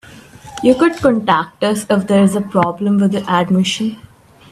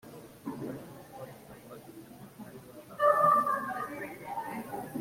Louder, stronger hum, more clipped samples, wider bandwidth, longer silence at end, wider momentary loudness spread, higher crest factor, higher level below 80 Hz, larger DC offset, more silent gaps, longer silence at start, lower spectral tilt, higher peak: first, -15 LUFS vs -30 LUFS; neither; neither; second, 14 kHz vs 16.5 kHz; first, 0.5 s vs 0 s; second, 6 LU vs 25 LU; second, 16 dB vs 22 dB; first, -50 dBFS vs -70 dBFS; neither; neither; about the same, 0.1 s vs 0.05 s; about the same, -6 dB/octave vs -5.5 dB/octave; first, 0 dBFS vs -12 dBFS